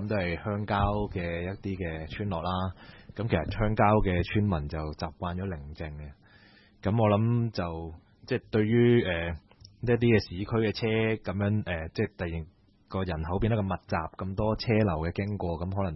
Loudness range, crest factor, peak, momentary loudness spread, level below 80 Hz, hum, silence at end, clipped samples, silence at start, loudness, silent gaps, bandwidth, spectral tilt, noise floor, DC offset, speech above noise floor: 5 LU; 20 dB; -10 dBFS; 13 LU; -44 dBFS; none; 0 s; under 0.1%; 0 s; -29 LUFS; none; 6 kHz; -9 dB/octave; -57 dBFS; under 0.1%; 29 dB